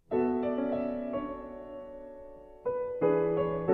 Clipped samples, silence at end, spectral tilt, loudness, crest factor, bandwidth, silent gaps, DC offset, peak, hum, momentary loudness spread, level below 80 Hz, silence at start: under 0.1%; 0 s; -10.5 dB/octave; -31 LUFS; 18 dB; 4.3 kHz; none; under 0.1%; -14 dBFS; none; 18 LU; -58 dBFS; 0.1 s